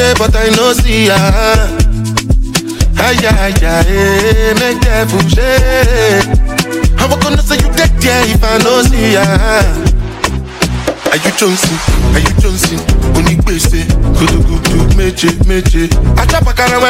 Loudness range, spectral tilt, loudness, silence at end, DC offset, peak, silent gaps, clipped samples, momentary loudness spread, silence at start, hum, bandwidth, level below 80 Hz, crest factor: 2 LU; -4.5 dB/octave; -10 LUFS; 0 s; under 0.1%; 0 dBFS; none; under 0.1%; 4 LU; 0 s; none; 16.5 kHz; -12 dBFS; 8 dB